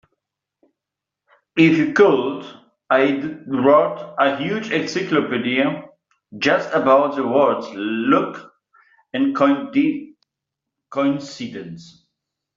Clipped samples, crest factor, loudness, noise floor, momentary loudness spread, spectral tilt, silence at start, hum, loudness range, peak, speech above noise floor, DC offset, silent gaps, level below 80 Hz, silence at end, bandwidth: under 0.1%; 18 dB; -19 LUFS; -85 dBFS; 16 LU; -4 dB/octave; 1.55 s; none; 5 LU; -2 dBFS; 67 dB; under 0.1%; none; -64 dBFS; 0.75 s; 7.6 kHz